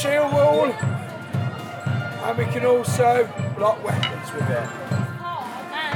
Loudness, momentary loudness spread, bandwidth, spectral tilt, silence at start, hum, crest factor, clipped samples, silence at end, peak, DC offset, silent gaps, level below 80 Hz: -23 LUFS; 12 LU; 18.5 kHz; -5.5 dB/octave; 0 s; none; 18 dB; under 0.1%; 0 s; -4 dBFS; under 0.1%; none; -64 dBFS